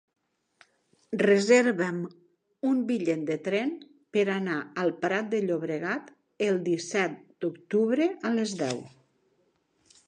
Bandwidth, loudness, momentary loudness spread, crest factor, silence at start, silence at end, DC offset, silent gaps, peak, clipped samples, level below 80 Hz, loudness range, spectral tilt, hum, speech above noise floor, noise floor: 10 kHz; -28 LUFS; 12 LU; 20 dB; 1.1 s; 1.2 s; under 0.1%; none; -8 dBFS; under 0.1%; -78 dBFS; 3 LU; -5 dB/octave; none; 44 dB; -71 dBFS